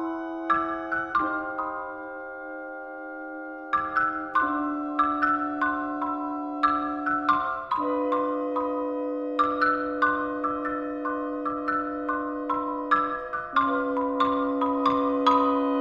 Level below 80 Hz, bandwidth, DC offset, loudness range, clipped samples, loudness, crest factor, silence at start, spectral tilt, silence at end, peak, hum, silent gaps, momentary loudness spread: -58 dBFS; 7 kHz; under 0.1%; 4 LU; under 0.1%; -26 LUFS; 18 dB; 0 s; -6 dB/octave; 0 s; -8 dBFS; none; none; 12 LU